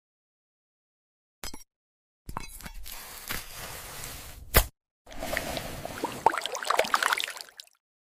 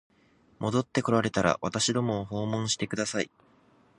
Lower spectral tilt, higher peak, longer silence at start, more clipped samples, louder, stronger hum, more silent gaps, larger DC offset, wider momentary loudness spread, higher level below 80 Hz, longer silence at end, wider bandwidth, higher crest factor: second, -2.5 dB/octave vs -4.5 dB/octave; about the same, -4 dBFS vs -6 dBFS; first, 1.45 s vs 0.6 s; neither; about the same, -30 LUFS vs -28 LUFS; neither; first, 1.76-2.25 s, 4.91-5.05 s vs none; neither; first, 18 LU vs 6 LU; first, -42 dBFS vs -58 dBFS; second, 0.45 s vs 0.7 s; first, 16 kHz vs 11.5 kHz; first, 28 dB vs 22 dB